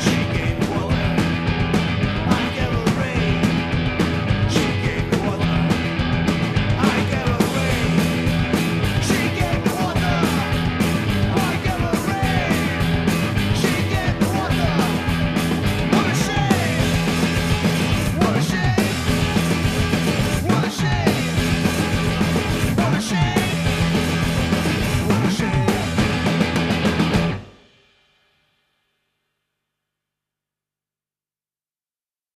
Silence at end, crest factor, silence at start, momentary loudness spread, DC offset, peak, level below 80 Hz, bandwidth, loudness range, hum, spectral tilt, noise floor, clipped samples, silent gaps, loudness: 4.85 s; 18 dB; 0 s; 2 LU; under 0.1%; -2 dBFS; -34 dBFS; 14 kHz; 1 LU; 50 Hz at -40 dBFS; -5.5 dB/octave; under -90 dBFS; under 0.1%; none; -20 LUFS